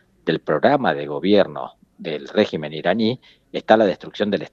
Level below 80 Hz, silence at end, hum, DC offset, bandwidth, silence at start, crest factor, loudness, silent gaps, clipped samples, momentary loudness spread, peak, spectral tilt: -62 dBFS; 0.05 s; none; under 0.1%; 7.4 kHz; 0.25 s; 20 dB; -20 LUFS; none; under 0.1%; 16 LU; 0 dBFS; -7 dB/octave